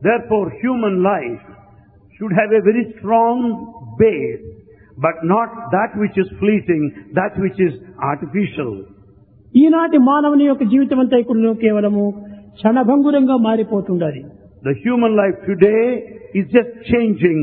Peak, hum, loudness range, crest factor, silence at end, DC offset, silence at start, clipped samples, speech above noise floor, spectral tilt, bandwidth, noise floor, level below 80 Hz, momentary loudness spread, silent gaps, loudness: 0 dBFS; none; 5 LU; 16 dB; 0 s; under 0.1%; 0 s; under 0.1%; 32 dB; -11.5 dB/octave; 4.1 kHz; -47 dBFS; -50 dBFS; 11 LU; none; -16 LUFS